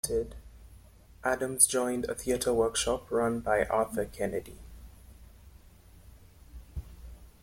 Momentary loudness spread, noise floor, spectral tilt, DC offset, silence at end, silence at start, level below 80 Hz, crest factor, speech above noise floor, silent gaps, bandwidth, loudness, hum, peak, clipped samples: 23 LU; -55 dBFS; -3 dB/octave; under 0.1%; 0.15 s; 0.05 s; -50 dBFS; 26 dB; 26 dB; none; 16.5 kHz; -29 LUFS; none; -6 dBFS; under 0.1%